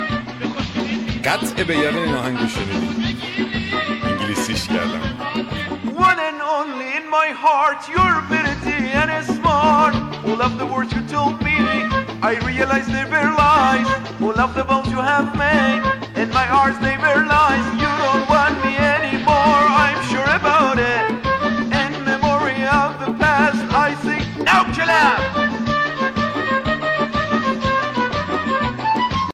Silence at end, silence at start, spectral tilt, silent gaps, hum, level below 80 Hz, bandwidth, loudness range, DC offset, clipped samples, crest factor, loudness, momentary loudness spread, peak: 0 s; 0 s; -5 dB/octave; none; none; -38 dBFS; 14 kHz; 5 LU; under 0.1%; under 0.1%; 14 dB; -18 LUFS; 8 LU; -4 dBFS